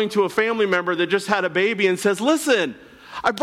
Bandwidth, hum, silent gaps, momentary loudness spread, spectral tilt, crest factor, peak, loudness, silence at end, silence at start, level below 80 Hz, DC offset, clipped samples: 15.5 kHz; none; none; 5 LU; -4 dB/octave; 14 dB; -6 dBFS; -20 LUFS; 0 s; 0 s; -62 dBFS; under 0.1%; under 0.1%